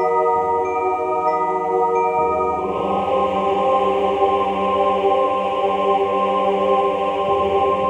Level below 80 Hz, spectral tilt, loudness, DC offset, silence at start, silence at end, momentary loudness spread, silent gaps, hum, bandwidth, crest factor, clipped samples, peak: -48 dBFS; -6.5 dB/octave; -19 LUFS; under 0.1%; 0 s; 0 s; 3 LU; none; none; 9.6 kHz; 14 dB; under 0.1%; -4 dBFS